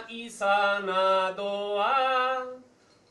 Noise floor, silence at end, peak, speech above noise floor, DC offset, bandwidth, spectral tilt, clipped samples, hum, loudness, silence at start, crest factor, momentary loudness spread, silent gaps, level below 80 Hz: -58 dBFS; 0.5 s; -12 dBFS; 32 dB; under 0.1%; 12 kHz; -3 dB/octave; under 0.1%; none; -26 LUFS; 0 s; 14 dB; 9 LU; none; -74 dBFS